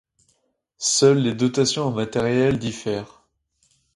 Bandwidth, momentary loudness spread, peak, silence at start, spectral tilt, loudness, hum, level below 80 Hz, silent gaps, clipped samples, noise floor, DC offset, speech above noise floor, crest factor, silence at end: 11.5 kHz; 11 LU; -4 dBFS; 0.8 s; -4.5 dB/octave; -21 LUFS; none; -54 dBFS; none; under 0.1%; -69 dBFS; under 0.1%; 48 dB; 18 dB; 0.9 s